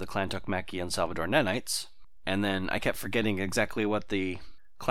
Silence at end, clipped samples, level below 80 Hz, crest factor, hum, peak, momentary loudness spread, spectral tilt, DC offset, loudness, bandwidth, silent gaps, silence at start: 0 s; under 0.1%; -50 dBFS; 22 dB; none; -8 dBFS; 8 LU; -4.5 dB/octave; 1%; -30 LUFS; 18 kHz; none; 0 s